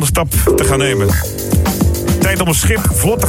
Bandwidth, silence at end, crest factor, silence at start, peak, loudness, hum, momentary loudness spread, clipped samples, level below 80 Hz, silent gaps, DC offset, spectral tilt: 17 kHz; 0 s; 12 dB; 0 s; 0 dBFS; -13 LUFS; none; 3 LU; under 0.1%; -22 dBFS; none; under 0.1%; -4.5 dB/octave